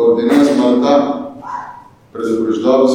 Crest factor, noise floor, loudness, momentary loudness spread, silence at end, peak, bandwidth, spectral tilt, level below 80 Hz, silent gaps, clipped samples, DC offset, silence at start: 12 dB; -36 dBFS; -13 LUFS; 16 LU; 0 s; 0 dBFS; 14 kHz; -5.5 dB/octave; -56 dBFS; none; under 0.1%; under 0.1%; 0 s